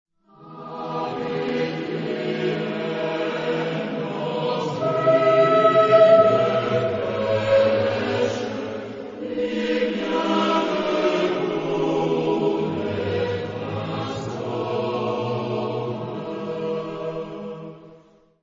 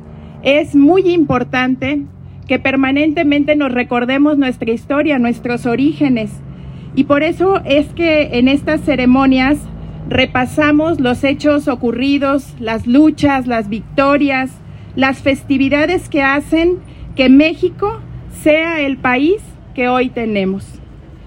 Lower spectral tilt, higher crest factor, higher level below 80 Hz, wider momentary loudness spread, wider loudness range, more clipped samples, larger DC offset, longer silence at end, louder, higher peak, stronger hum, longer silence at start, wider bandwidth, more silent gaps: about the same, -6.5 dB/octave vs -6.5 dB/octave; about the same, 18 dB vs 14 dB; second, -60 dBFS vs -38 dBFS; first, 14 LU vs 10 LU; first, 9 LU vs 2 LU; neither; neither; first, 0.45 s vs 0 s; second, -22 LUFS vs -14 LUFS; second, -4 dBFS vs 0 dBFS; neither; first, 0.4 s vs 0 s; second, 7.6 kHz vs 12 kHz; neither